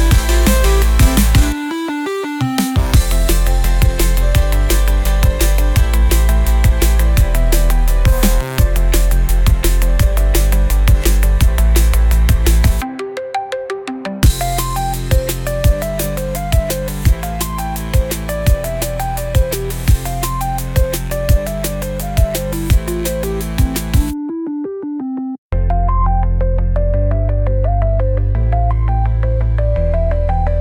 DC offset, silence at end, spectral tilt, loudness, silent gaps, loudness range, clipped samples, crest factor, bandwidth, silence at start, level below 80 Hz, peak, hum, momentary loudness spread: under 0.1%; 0 s; -5.5 dB/octave; -16 LUFS; 25.38-25.50 s; 4 LU; under 0.1%; 12 dB; 19 kHz; 0 s; -14 dBFS; -2 dBFS; none; 7 LU